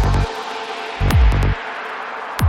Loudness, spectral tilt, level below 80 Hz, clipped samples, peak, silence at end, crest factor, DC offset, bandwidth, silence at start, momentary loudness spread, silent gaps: -20 LUFS; -6 dB/octave; -20 dBFS; under 0.1%; -4 dBFS; 0 s; 14 dB; under 0.1%; 17 kHz; 0 s; 11 LU; none